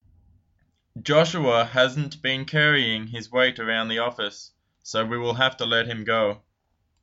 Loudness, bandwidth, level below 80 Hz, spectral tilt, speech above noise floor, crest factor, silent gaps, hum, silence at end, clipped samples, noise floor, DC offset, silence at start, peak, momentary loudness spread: -23 LUFS; 8 kHz; -62 dBFS; -4.5 dB/octave; 48 dB; 20 dB; none; none; 0.65 s; under 0.1%; -72 dBFS; under 0.1%; 0.95 s; -4 dBFS; 10 LU